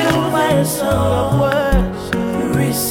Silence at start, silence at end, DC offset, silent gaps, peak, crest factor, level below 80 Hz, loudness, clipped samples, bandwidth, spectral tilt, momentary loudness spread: 0 s; 0 s; under 0.1%; none; -2 dBFS; 14 dB; -26 dBFS; -16 LUFS; under 0.1%; 18 kHz; -5.5 dB/octave; 4 LU